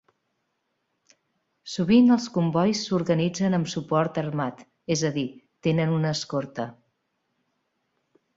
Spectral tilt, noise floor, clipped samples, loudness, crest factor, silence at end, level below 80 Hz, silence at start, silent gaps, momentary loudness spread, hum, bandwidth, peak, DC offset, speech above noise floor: -6 dB/octave; -76 dBFS; under 0.1%; -25 LUFS; 18 dB; 1.65 s; -62 dBFS; 1.65 s; none; 15 LU; none; 7.8 kHz; -8 dBFS; under 0.1%; 53 dB